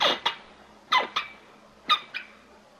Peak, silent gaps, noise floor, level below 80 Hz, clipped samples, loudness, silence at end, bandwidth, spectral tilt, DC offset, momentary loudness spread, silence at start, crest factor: -8 dBFS; none; -53 dBFS; -70 dBFS; under 0.1%; -27 LUFS; 0.55 s; 16 kHz; -1 dB/octave; under 0.1%; 17 LU; 0 s; 22 dB